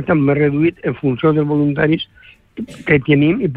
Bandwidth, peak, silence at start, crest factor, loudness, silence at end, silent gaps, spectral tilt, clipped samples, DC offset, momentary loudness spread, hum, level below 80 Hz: 8 kHz; -2 dBFS; 0 s; 14 dB; -15 LUFS; 0 s; none; -9 dB/octave; under 0.1%; under 0.1%; 17 LU; none; -46 dBFS